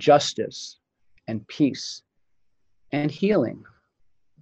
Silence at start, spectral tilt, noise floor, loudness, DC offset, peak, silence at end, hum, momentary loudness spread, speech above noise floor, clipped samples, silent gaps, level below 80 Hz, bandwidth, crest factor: 0 s; -5 dB/octave; -74 dBFS; -25 LUFS; under 0.1%; -4 dBFS; 0.8 s; none; 20 LU; 51 dB; under 0.1%; none; -66 dBFS; 8.4 kHz; 22 dB